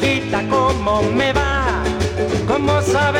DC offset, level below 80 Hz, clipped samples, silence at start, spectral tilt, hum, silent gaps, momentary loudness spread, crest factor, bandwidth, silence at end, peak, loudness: under 0.1%; -30 dBFS; under 0.1%; 0 s; -5.5 dB/octave; none; none; 4 LU; 14 dB; 16 kHz; 0 s; -2 dBFS; -17 LUFS